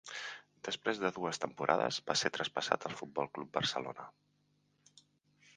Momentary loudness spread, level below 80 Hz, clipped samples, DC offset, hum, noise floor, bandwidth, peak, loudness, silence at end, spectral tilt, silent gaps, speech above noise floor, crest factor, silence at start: 13 LU; -76 dBFS; under 0.1%; under 0.1%; 50 Hz at -65 dBFS; -75 dBFS; 10 kHz; -10 dBFS; -36 LUFS; 1.45 s; -3 dB/octave; none; 39 dB; 28 dB; 0.05 s